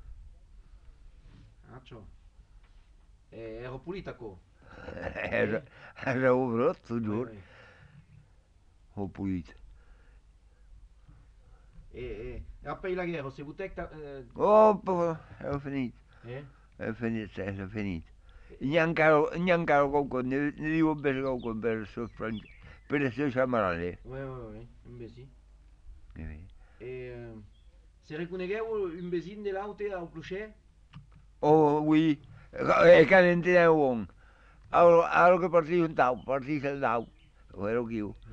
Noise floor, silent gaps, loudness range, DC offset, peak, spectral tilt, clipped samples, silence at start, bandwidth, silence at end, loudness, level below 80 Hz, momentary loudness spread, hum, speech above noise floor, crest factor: -61 dBFS; none; 21 LU; under 0.1%; -8 dBFS; -7.5 dB/octave; under 0.1%; 0.05 s; 7.6 kHz; 0 s; -27 LUFS; -54 dBFS; 22 LU; none; 33 dB; 22 dB